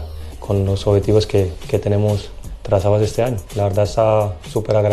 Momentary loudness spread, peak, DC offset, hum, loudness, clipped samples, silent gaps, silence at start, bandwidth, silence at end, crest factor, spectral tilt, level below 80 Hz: 9 LU; -2 dBFS; under 0.1%; none; -18 LUFS; under 0.1%; none; 0 s; 13.5 kHz; 0 s; 14 dB; -7 dB/octave; -34 dBFS